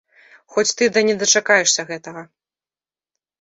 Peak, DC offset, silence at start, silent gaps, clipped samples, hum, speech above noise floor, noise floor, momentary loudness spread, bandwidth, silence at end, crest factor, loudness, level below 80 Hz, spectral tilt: -2 dBFS; under 0.1%; 0.5 s; none; under 0.1%; none; over 72 dB; under -90 dBFS; 18 LU; 8 kHz; 1.15 s; 20 dB; -16 LUFS; -66 dBFS; -1 dB/octave